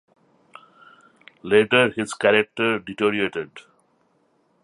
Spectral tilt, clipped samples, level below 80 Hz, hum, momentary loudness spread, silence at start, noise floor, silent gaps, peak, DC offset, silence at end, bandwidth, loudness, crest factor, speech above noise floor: -4.5 dB/octave; under 0.1%; -64 dBFS; none; 14 LU; 1.45 s; -65 dBFS; none; -2 dBFS; under 0.1%; 1.05 s; 11.5 kHz; -20 LUFS; 22 dB; 44 dB